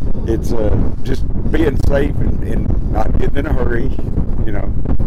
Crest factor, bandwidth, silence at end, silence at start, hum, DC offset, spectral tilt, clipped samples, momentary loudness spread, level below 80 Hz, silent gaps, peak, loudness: 8 dB; 6.8 kHz; 0 s; 0 s; none; under 0.1%; -8.5 dB/octave; under 0.1%; 5 LU; -18 dBFS; none; -4 dBFS; -19 LUFS